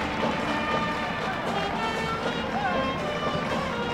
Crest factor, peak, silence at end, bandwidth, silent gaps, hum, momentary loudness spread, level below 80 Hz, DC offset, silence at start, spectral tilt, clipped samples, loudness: 14 dB; -14 dBFS; 0 s; 16 kHz; none; none; 2 LU; -46 dBFS; under 0.1%; 0 s; -5 dB/octave; under 0.1%; -27 LUFS